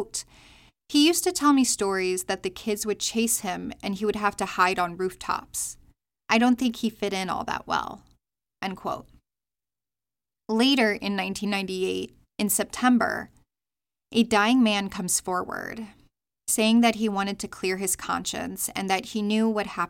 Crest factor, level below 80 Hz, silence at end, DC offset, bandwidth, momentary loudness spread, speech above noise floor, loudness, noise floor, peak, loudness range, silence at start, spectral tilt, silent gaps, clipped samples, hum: 20 dB; -58 dBFS; 0 s; under 0.1%; 17 kHz; 13 LU; over 65 dB; -25 LUFS; under -90 dBFS; -6 dBFS; 4 LU; 0 s; -3 dB/octave; none; under 0.1%; none